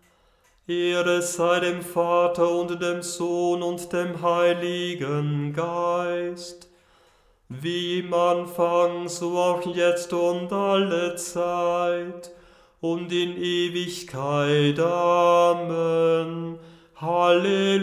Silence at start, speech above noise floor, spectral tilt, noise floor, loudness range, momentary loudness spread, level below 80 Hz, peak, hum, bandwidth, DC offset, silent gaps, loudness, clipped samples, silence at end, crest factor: 0.7 s; 38 dB; -5 dB/octave; -61 dBFS; 5 LU; 10 LU; -66 dBFS; -8 dBFS; none; 15.5 kHz; under 0.1%; none; -24 LUFS; under 0.1%; 0 s; 16 dB